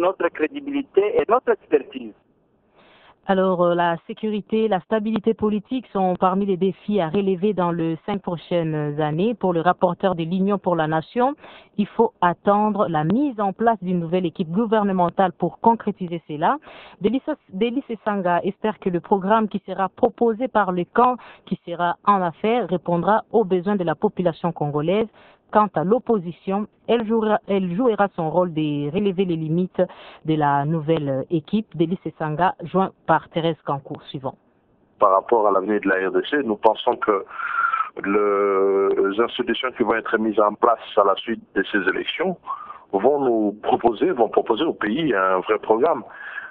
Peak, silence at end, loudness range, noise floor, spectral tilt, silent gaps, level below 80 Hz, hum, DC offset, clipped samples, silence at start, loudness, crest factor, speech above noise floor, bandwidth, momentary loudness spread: 0 dBFS; 0 s; 3 LU; -62 dBFS; -10 dB/octave; none; -58 dBFS; none; under 0.1%; under 0.1%; 0 s; -21 LUFS; 20 dB; 41 dB; 4.4 kHz; 7 LU